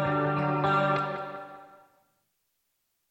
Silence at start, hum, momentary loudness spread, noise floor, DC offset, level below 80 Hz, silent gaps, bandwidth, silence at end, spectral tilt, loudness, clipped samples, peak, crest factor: 0 s; none; 16 LU; -77 dBFS; under 0.1%; -66 dBFS; none; 8.2 kHz; 1.45 s; -8 dB/octave; -27 LUFS; under 0.1%; -14 dBFS; 18 dB